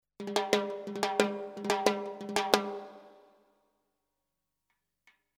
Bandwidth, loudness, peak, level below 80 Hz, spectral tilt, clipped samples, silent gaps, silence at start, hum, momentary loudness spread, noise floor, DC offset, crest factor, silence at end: 19.5 kHz; -31 LUFS; -2 dBFS; -76 dBFS; -3 dB/octave; under 0.1%; none; 0.2 s; 50 Hz at -85 dBFS; 10 LU; -85 dBFS; under 0.1%; 34 dB; 2.25 s